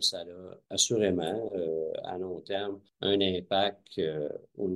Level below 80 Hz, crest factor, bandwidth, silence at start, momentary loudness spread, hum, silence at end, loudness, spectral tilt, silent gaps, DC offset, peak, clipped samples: -68 dBFS; 22 dB; 12 kHz; 0 s; 11 LU; none; 0 s; -31 LUFS; -3 dB/octave; none; under 0.1%; -10 dBFS; under 0.1%